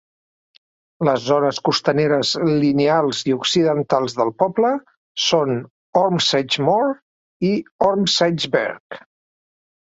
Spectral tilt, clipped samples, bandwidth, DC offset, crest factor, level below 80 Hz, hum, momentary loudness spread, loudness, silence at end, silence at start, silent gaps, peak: -4.5 dB/octave; under 0.1%; 8 kHz; under 0.1%; 18 dB; -60 dBFS; none; 7 LU; -19 LUFS; 0.95 s; 1 s; 4.97-5.15 s, 5.70-5.93 s, 7.02-7.40 s, 7.71-7.79 s, 8.80-8.90 s; -2 dBFS